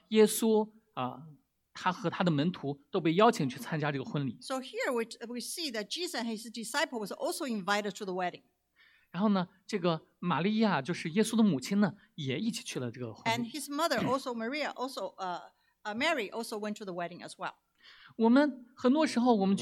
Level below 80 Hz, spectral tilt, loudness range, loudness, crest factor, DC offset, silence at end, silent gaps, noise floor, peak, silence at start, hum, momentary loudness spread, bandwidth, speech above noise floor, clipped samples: -78 dBFS; -5 dB/octave; 4 LU; -32 LUFS; 22 dB; under 0.1%; 0 s; none; -66 dBFS; -10 dBFS; 0.1 s; none; 13 LU; 17 kHz; 35 dB; under 0.1%